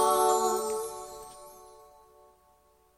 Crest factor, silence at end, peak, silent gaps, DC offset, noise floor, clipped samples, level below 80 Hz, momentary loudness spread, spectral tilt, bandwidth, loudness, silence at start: 18 dB; 1.3 s; -12 dBFS; none; under 0.1%; -64 dBFS; under 0.1%; -66 dBFS; 25 LU; -2 dB/octave; 16 kHz; -28 LUFS; 0 s